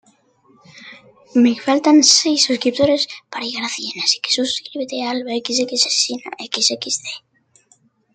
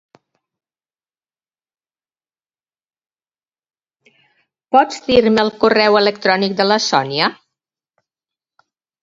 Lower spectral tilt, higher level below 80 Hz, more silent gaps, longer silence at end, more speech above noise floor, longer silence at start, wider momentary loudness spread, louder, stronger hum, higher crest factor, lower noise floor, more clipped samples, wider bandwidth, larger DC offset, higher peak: second, -1.5 dB/octave vs -4 dB/octave; second, -64 dBFS vs -54 dBFS; neither; second, 0.95 s vs 1.7 s; second, 40 dB vs over 76 dB; second, 0.75 s vs 4.7 s; first, 14 LU vs 4 LU; second, -17 LUFS vs -14 LUFS; neither; about the same, 20 dB vs 20 dB; second, -57 dBFS vs under -90 dBFS; neither; first, 9.4 kHz vs 7.8 kHz; neither; about the same, 0 dBFS vs 0 dBFS